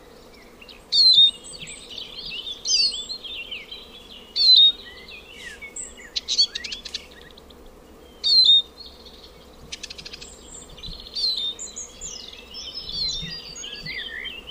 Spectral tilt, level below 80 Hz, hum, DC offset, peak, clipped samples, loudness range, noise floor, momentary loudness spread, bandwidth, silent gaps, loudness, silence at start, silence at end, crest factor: 0.5 dB/octave; -50 dBFS; none; under 0.1%; -6 dBFS; under 0.1%; 11 LU; -47 dBFS; 26 LU; 15.5 kHz; none; -18 LUFS; 0.7 s; 0 s; 20 dB